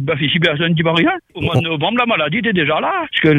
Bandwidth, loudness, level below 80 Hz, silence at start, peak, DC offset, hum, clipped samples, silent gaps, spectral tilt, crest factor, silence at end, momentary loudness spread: 9.6 kHz; -16 LUFS; -48 dBFS; 0 s; -2 dBFS; under 0.1%; none; under 0.1%; none; -7 dB/octave; 14 dB; 0 s; 3 LU